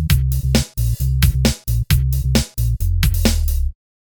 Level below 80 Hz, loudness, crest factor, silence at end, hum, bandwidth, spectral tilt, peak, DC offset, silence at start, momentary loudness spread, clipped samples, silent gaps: -20 dBFS; -19 LUFS; 16 dB; 0.35 s; none; over 20 kHz; -5 dB/octave; 0 dBFS; under 0.1%; 0 s; 5 LU; under 0.1%; none